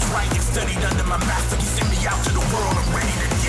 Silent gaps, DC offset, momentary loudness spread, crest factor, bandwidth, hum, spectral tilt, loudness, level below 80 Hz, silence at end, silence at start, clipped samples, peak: none; under 0.1%; 1 LU; 8 dB; 11 kHz; none; -4 dB/octave; -21 LUFS; -24 dBFS; 0 s; 0 s; under 0.1%; -12 dBFS